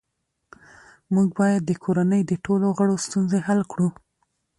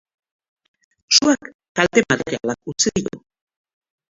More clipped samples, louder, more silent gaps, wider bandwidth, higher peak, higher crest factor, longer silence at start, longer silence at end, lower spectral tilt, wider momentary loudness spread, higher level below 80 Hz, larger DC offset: neither; second, -22 LUFS vs -18 LUFS; second, none vs 1.54-1.59 s, 1.69-1.75 s; first, 11.5 kHz vs 7.8 kHz; second, -8 dBFS vs 0 dBFS; second, 14 dB vs 22 dB; about the same, 1.1 s vs 1.1 s; second, 0.7 s vs 0.95 s; first, -7 dB/octave vs -2.5 dB/octave; second, 5 LU vs 12 LU; second, -60 dBFS vs -54 dBFS; neither